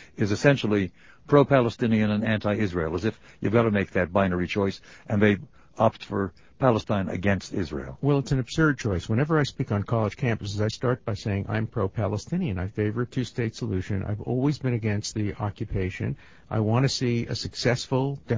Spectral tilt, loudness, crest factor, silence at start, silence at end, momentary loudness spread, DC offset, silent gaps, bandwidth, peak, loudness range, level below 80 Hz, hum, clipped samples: -6.5 dB/octave; -26 LUFS; 22 dB; 0 s; 0 s; 8 LU; 0.2%; none; 7.8 kHz; -4 dBFS; 5 LU; -46 dBFS; none; under 0.1%